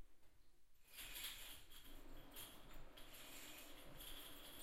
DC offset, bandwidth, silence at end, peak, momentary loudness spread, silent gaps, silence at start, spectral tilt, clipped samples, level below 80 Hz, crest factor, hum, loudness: under 0.1%; 16 kHz; 0 s; -38 dBFS; 12 LU; none; 0 s; -1.5 dB/octave; under 0.1%; -62 dBFS; 18 dB; none; -56 LUFS